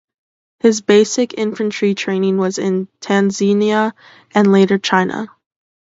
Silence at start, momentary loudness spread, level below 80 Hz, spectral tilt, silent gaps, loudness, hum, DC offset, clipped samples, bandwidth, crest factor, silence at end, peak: 0.65 s; 8 LU; -64 dBFS; -5 dB/octave; none; -16 LUFS; none; under 0.1%; under 0.1%; 8 kHz; 16 dB; 0.7 s; 0 dBFS